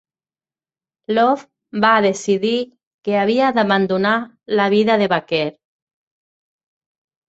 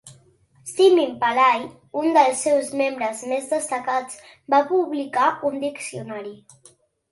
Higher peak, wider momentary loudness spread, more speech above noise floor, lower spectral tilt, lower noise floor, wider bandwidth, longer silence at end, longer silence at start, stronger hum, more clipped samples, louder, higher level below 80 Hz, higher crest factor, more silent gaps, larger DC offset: about the same, -2 dBFS vs -4 dBFS; second, 9 LU vs 16 LU; first, over 73 dB vs 35 dB; first, -5 dB/octave vs -3.5 dB/octave; first, under -90 dBFS vs -56 dBFS; second, 8.2 kHz vs 12 kHz; first, 1.8 s vs 0.75 s; first, 1.1 s vs 0.05 s; neither; neither; first, -17 LUFS vs -21 LUFS; first, -64 dBFS vs -70 dBFS; about the same, 18 dB vs 18 dB; first, 2.87-2.99 s vs none; neither